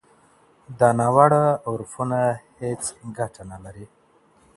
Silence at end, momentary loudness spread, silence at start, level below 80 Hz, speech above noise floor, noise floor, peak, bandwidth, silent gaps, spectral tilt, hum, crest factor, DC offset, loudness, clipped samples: 0.7 s; 22 LU; 0.7 s; -58 dBFS; 36 dB; -58 dBFS; 0 dBFS; 11.5 kHz; none; -6.5 dB/octave; none; 22 dB; under 0.1%; -21 LUFS; under 0.1%